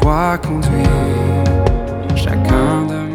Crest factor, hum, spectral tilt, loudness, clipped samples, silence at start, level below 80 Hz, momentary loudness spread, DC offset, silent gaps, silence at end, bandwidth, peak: 14 dB; none; -7.5 dB/octave; -15 LUFS; under 0.1%; 0 s; -22 dBFS; 4 LU; under 0.1%; none; 0 s; 15.5 kHz; 0 dBFS